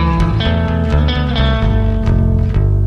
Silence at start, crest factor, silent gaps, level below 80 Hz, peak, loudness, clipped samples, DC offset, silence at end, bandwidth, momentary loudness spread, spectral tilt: 0 s; 10 dB; none; -16 dBFS; -2 dBFS; -15 LUFS; under 0.1%; under 0.1%; 0 s; 6.4 kHz; 1 LU; -8 dB/octave